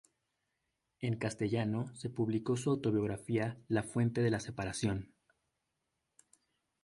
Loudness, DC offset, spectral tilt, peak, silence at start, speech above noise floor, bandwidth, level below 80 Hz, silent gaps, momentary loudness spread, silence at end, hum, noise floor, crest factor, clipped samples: -35 LUFS; under 0.1%; -6.5 dB/octave; -18 dBFS; 1 s; 51 dB; 11.5 kHz; -62 dBFS; none; 7 LU; 1.8 s; none; -85 dBFS; 18 dB; under 0.1%